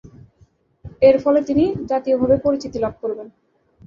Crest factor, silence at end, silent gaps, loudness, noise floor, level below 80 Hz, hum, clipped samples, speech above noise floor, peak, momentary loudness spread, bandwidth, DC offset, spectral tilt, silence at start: 18 dB; 0.6 s; none; -18 LUFS; -56 dBFS; -46 dBFS; none; under 0.1%; 39 dB; -2 dBFS; 12 LU; 7.2 kHz; under 0.1%; -7.5 dB/octave; 0.05 s